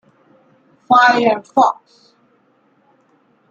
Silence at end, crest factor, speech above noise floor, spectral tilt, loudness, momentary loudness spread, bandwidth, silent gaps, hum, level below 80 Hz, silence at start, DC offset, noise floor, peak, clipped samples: 1.8 s; 16 dB; 44 dB; -4 dB/octave; -14 LUFS; 6 LU; 7.6 kHz; none; none; -68 dBFS; 0.9 s; under 0.1%; -58 dBFS; -2 dBFS; under 0.1%